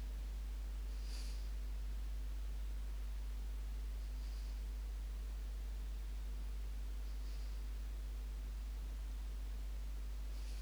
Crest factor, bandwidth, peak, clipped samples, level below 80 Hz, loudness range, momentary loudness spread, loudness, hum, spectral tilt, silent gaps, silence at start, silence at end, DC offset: 8 dB; over 20 kHz; -36 dBFS; under 0.1%; -44 dBFS; 1 LU; 1 LU; -48 LUFS; none; -5 dB/octave; none; 0 s; 0 s; under 0.1%